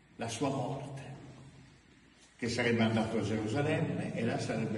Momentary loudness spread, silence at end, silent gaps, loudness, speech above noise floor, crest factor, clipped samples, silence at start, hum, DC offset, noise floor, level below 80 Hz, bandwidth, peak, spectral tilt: 17 LU; 0 s; none; -34 LUFS; 28 dB; 16 dB; under 0.1%; 0.2 s; none; under 0.1%; -61 dBFS; -64 dBFS; 11.5 kHz; -18 dBFS; -6 dB/octave